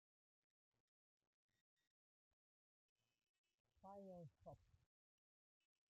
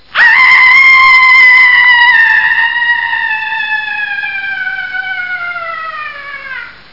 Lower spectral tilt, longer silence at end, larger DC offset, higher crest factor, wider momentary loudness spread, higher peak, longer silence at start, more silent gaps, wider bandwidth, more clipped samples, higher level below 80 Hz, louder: first, -8.5 dB/octave vs -0.5 dB/octave; first, 1.15 s vs 0.2 s; second, under 0.1% vs 0.8%; first, 20 dB vs 8 dB; second, 6 LU vs 19 LU; second, -50 dBFS vs 0 dBFS; first, 3.75 s vs 0.15 s; neither; about the same, 5.6 kHz vs 6 kHz; second, under 0.1% vs 0.3%; second, -90 dBFS vs -48 dBFS; second, -63 LUFS vs -5 LUFS